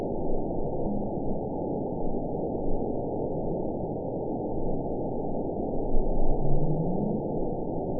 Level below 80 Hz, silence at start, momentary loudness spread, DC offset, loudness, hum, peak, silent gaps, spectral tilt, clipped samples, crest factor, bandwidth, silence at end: -32 dBFS; 0 s; 3 LU; 0.6%; -31 LUFS; none; -10 dBFS; none; -18 dB/octave; under 0.1%; 16 dB; 1 kHz; 0 s